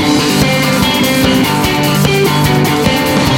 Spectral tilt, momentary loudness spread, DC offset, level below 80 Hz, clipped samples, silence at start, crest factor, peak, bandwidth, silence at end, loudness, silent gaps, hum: -4.5 dB/octave; 1 LU; under 0.1%; -30 dBFS; under 0.1%; 0 s; 10 dB; 0 dBFS; 17 kHz; 0 s; -11 LUFS; none; none